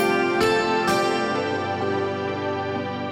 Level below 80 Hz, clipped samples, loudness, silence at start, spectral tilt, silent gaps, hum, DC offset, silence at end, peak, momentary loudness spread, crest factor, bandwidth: -56 dBFS; under 0.1%; -23 LUFS; 0 s; -5 dB/octave; none; none; under 0.1%; 0 s; -8 dBFS; 7 LU; 14 dB; 16 kHz